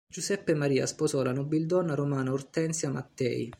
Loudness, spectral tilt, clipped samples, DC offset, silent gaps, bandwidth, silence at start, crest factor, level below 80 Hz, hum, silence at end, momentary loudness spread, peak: -29 LUFS; -5.5 dB/octave; under 0.1%; under 0.1%; none; 15.5 kHz; 0.15 s; 16 dB; -66 dBFS; none; 0.05 s; 5 LU; -14 dBFS